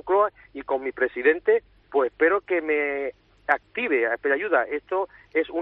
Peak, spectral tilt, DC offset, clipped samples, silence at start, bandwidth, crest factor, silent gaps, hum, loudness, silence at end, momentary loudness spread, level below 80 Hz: -6 dBFS; -1.5 dB/octave; under 0.1%; under 0.1%; 0.05 s; 4.1 kHz; 18 dB; none; none; -24 LUFS; 0 s; 7 LU; -62 dBFS